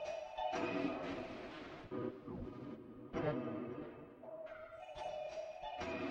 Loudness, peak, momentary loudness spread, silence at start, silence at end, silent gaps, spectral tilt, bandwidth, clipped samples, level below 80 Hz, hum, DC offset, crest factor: -45 LUFS; -26 dBFS; 12 LU; 0 s; 0 s; none; -6.5 dB/octave; 9.2 kHz; under 0.1%; -66 dBFS; none; under 0.1%; 18 dB